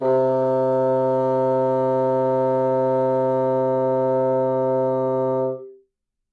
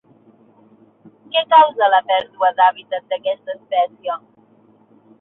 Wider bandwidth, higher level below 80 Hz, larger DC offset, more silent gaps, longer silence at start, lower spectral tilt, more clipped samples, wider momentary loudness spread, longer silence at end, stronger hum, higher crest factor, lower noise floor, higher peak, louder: first, 4.7 kHz vs 4.1 kHz; about the same, -72 dBFS vs -72 dBFS; neither; neither; second, 0 s vs 1.35 s; first, -10 dB/octave vs -5 dB/octave; neither; second, 2 LU vs 15 LU; second, 0.6 s vs 1.05 s; neither; second, 8 dB vs 18 dB; first, -72 dBFS vs -53 dBFS; second, -12 dBFS vs -2 dBFS; second, -20 LUFS vs -17 LUFS